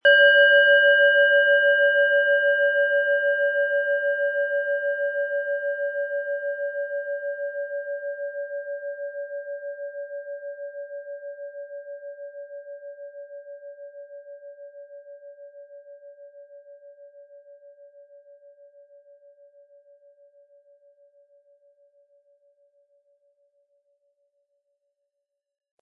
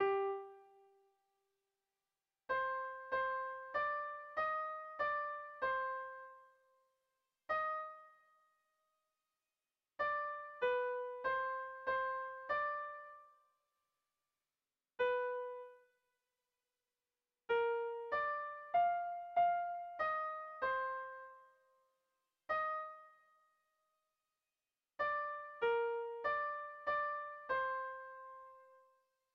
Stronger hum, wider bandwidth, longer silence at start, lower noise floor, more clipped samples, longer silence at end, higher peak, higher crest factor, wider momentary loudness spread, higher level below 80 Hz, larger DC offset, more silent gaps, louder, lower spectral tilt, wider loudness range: neither; second, 4.8 kHz vs 6.2 kHz; about the same, 0.05 s vs 0 s; second, -83 dBFS vs under -90 dBFS; neither; first, 8.1 s vs 0.55 s; first, -6 dBFS vs -26 dBFS; about the same, 20 dB vs 18 dB; first, 26 LU vs 17 LU; second, under -90 dBFS vs -78 dBFS; neither; neither; first, -21 LUFS vs -40 LUFS; about the same, 0 dB/octave vs 0 dB/octave; first, 26 LU vs 7 LU